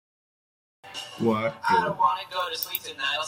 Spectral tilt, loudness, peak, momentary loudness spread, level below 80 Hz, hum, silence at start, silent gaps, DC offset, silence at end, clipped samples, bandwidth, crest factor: -4 dB/octave; -26 LUFS; -8 dBFS; 12 LU; -70 dBFS; none; 0.85 s; none; under 0.1%; 0 s; under 0.1%; 16.5 kHz; 18 dB